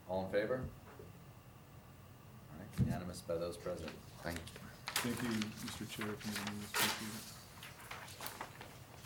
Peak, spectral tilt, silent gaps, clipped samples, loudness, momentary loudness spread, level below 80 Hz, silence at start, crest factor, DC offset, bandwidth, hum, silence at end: -20 dBFS; -4 dB/octave; none; under 0.1%; -41 LUFS; 20 LU; -64 dBFS; 0 s; 24 dB; under 0.1%; over 20 kHz; none; 0 s